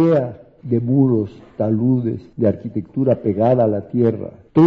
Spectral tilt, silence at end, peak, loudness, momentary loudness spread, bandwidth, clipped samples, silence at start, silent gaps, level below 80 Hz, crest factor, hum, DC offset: -11.5 dB/octave; 0 s; -4 dBFS; -19 LUFS; 10 LU; 5.2 kHz; under 0.1%; 0 s; none; -54 dBFS; 14 dB; none; under 0.1%